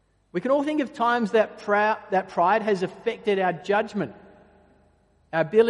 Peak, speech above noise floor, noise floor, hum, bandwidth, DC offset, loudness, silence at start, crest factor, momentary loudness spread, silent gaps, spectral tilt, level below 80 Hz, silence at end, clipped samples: -6 dBFS; 39 dB; -62 dBFS; none; 11 kHz; under 0.1%; -24 LUFS; 0.35 s; 18 dB; 8 LU; none; -6.5 dB/octave; -66 dBFS; 0 s; under 0.1%